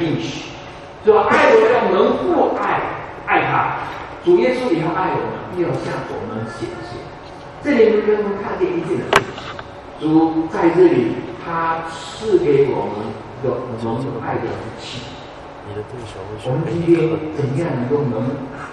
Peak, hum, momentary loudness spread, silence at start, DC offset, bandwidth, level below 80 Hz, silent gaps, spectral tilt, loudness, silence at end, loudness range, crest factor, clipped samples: 0 dBFS; none; 17 LU; 0 s; under 0.1%; 11.5 kHz; -48 dBFS; none; -6.5 dB/octave; -18 LUFS; 0 s; 7 LU; 18 dB; under 0.1%